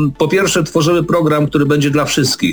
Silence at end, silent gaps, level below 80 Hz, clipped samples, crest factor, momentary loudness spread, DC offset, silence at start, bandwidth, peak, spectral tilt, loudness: 0 s; none; -42 dBFS; under 0.1%; 12 dB; 1 LU; under 0.1%; 0 s; over 20 kHz; -2 dBFS; -5 dB/octave; -13 LUFS